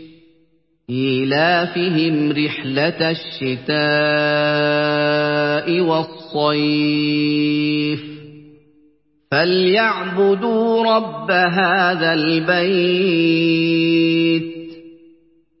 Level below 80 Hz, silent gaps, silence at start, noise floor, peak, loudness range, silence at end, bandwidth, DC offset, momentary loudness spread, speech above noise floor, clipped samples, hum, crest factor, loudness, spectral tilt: -62 dBFS; none; 0 s; -60 dBFS; -2 dBFS; 3 LU; 0.65 s; 5.8 kHz; under 0.1%; 7 LU; 43 dB; under 0.1%; none; 16 dB; -17 LUFS; -10 dB/octave